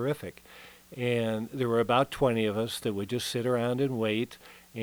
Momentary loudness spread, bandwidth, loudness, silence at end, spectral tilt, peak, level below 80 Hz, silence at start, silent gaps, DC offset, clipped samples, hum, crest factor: 20 LU; over 20 kHz; -29 LUFS; 0 s; -5.5 dB/octave; -10 dBFS; -60 dBFS; 0 s; none; under 0.1%; under 0.1%; none; 20 dB